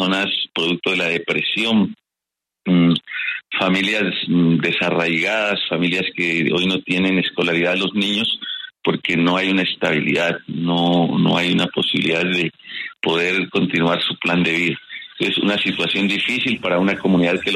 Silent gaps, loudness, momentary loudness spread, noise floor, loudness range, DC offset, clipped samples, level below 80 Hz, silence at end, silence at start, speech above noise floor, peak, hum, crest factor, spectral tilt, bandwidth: none; -18 LUFS; 5 LU; -85 dBFS; 1 LU; under 0.1%; under 0.1%; -58 dBFS; 0 s; 0 s; 66 dB; -2 dBFS; none; 16 dB; -5.5 dB/octave; 11.5 kHz